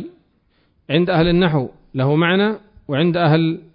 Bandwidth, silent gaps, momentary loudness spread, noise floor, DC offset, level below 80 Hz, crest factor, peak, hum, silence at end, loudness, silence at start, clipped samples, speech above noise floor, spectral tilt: 5.2 kHz; none; 10 LU; -61 dBFS; under 0.1%; -44 dBFS; 14 dB; -4 dBFS; none; 0.15 s; -17 LUFS; 0 s; under 0.1%; 45 dB; -12 dB/octave